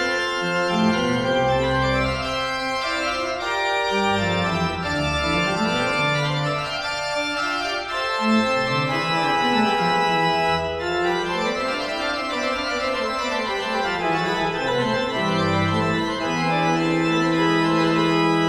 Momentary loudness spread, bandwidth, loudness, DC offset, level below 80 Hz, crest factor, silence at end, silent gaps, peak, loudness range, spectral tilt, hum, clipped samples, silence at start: 5 LU; 15 kHz; -21 LUFS; under 0.1%; -44 dBFS; 14 dB; 0 s; none; -8 dBFS; 3 LU; -5 dB/octave; none; under 0.1%; 0 s